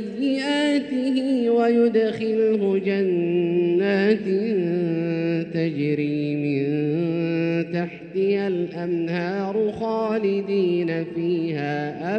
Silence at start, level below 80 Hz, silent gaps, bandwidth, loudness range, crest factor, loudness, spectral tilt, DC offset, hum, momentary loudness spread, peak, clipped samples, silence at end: 0 s; -66 dBFS; none; 9.2 kHz; 4 LU; 14 dB; -23 LUFS; -7.5 dB/octave; under 0.1%; none; 6 LU; -8 dBFS; under 0.1%; 0 s